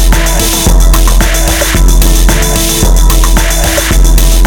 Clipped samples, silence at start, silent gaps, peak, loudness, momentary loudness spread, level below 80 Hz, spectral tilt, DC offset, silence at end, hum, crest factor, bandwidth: 0.6%; 0 s; none; 0 dBFS; -8 LUFS; 1 LU; -6 dBFS; -3.5 dB/octave; under 0.1%; 0 s; none; 6 dB; 19.5 kHz